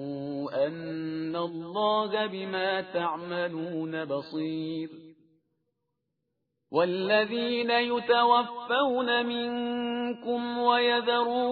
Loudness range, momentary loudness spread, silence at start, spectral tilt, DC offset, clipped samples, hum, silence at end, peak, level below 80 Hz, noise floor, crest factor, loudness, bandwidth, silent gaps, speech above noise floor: 8 LU; 9 LU; 0 s; -7.5 dB/octave; under 0.1%; under 0.1%; none; 0 s; -10 dBFS; -74 dBFS; -82 dBFS; 18 dB; -28 LUFS; 5 kHz; none; 54 dB